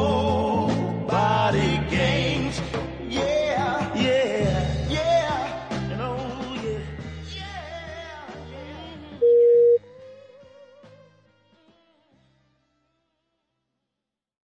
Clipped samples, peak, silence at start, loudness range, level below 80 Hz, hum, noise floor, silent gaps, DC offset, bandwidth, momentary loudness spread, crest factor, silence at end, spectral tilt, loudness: under 0.1%; -10 dBFS; 0 s; 8 LU; -42 dBFS; none; -85 dBFS; none; under 0.1%; 9.8 kHz; 18 LU; 16 dB; 3.65 s; -6 dB/octave; -23 LUFS